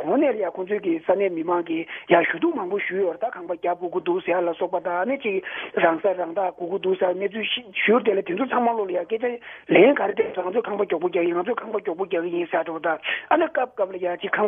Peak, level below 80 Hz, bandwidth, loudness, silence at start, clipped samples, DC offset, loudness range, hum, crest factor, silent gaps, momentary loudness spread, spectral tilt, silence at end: -2 dBFS; -70 dBFS; 3.7 kHz; -23 LUFS; 0 s; under 0.1%; under 0.1%; 3 LU; none; 22 dB; none; 8 LU; -8.5 dB/octave; 0 s